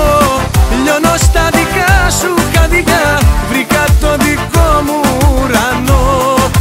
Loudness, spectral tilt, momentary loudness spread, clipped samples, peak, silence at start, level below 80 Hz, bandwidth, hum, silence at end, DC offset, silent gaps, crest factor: -10 LUFS; -4.5 dB/octave; 2 LU; under 0.1%; 0 dBFS; 0 s; -14 dBFS; 16.5 kHz; none; 0 s; under 0.1%; none; 10 dB